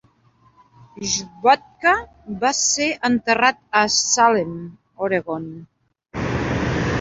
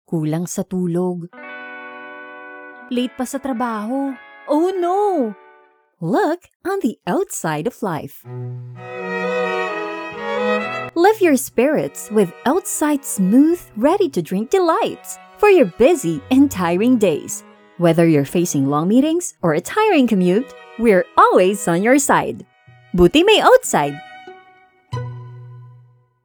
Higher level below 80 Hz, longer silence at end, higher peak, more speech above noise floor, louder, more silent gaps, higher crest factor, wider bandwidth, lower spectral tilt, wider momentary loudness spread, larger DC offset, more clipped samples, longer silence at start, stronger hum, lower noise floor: about the same, -44 dBFS vs -48 dBFS; second, 0 s vs 0.55 s; about the same, -2 dBFS vs 0 dBFS; about the same, 37 dB vs 36 dB; about the same, -19 LUFS vs -17 LUFS; second, none vs 6.56-6.60 s; about the same, 20 dB vs 18 dB; second, 8 kHz vs over 20 kHz; second, -3 dB/octave vs -5 dB/octave; second, 14 LU vs 19 LU; neither; neither; first, 0.95 s vs 0.1 s; neither; first, -57 dBFS vs -53 dBFS